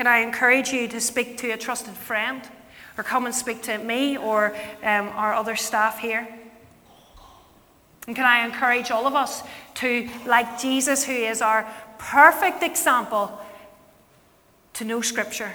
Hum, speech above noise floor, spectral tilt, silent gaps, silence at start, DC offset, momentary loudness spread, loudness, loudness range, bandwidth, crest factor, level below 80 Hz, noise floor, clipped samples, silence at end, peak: none; 35 dB; -1.5 dB/octave; none; 0 s; under 0.1%; 15 LU; -22 LUFS; 6 LU; over 20 kHz; 24 dB; -62 dBFS; -58 dBFS; under 0.1%; 0 s; 0 dBFS